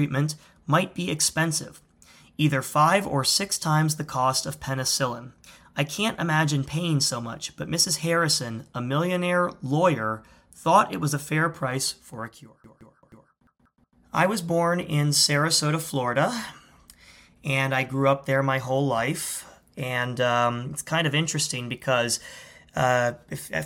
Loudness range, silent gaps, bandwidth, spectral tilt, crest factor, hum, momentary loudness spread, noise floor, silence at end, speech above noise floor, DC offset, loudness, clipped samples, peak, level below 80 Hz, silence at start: 3 LU; none; 17.5 kHz; -4 dB/octave; 22 dB; none; 13 LU; -65 dBFS; 0 s; 40 dB; under 0.1%; -24 LUFS; under 0.1%; -4 dBFS; -60 dBFS; 0 s